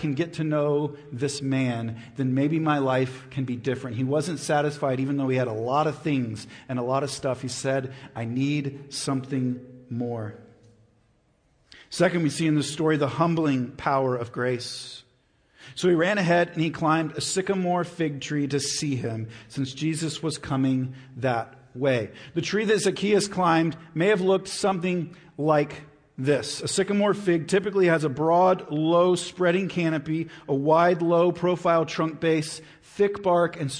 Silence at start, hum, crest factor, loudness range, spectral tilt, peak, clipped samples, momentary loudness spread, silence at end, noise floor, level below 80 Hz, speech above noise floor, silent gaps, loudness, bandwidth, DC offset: 0 s; none; 18 dB; 6 LU; -5.5 dB/octave; -8 dBFS; under 0.1%; 11 LU; 0 s; -65 dBFS; -62 dBFS; 40 dB; none; -25 LUFS; 10.5 kHz; under 0.1%